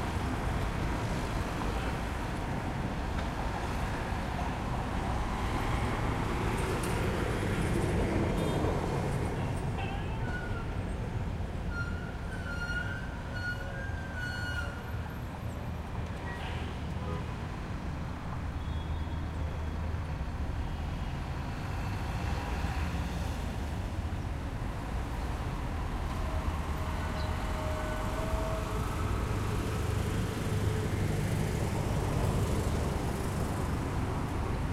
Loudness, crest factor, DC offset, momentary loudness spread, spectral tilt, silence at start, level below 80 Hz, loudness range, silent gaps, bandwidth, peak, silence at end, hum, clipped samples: -34 LUFS; 16 dB; under 0.1%; 6 LU; -6 dB/octave; 0 s; -38 dBFS; 5 LU; none; 15.5 kHz; -18 dBFS; 0 s; none; under 0.1%